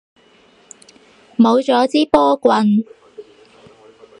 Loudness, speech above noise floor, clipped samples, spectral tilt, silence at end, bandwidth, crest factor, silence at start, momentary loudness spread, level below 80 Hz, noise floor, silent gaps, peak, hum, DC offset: -14 LUFS; 37 dB; under 0.1%; -6 dB/octave; 1 s; 10.5 kHz; 18 dB; 1.4 s; 8 LU; -54 dBFS; -51 dBFS; none; 0 dBFS; none; under 0.1%